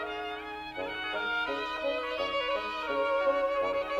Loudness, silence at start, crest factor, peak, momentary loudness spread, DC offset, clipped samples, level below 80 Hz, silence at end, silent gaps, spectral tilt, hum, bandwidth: -31 LUFS; 0 s; 14 dB; -18 dBFS; 9 LU; under 0.1%; under 0.1%; -60 dBFS; 0 s; none; -3.5 dB/octave; 60 Hz at -60 dBFS; 12 kHz